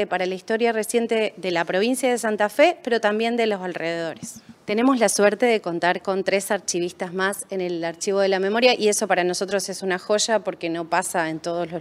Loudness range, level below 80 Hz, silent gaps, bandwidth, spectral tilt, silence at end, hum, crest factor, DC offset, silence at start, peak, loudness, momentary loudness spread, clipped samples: 1 LU; -72 dBFS; none; 16 kHz; -3.5 dB/octave; 0 s; none; 20 dB; under 0.1%; 0 s; -2 dBFS; -22 LUFS; 9 LU; under 0.1%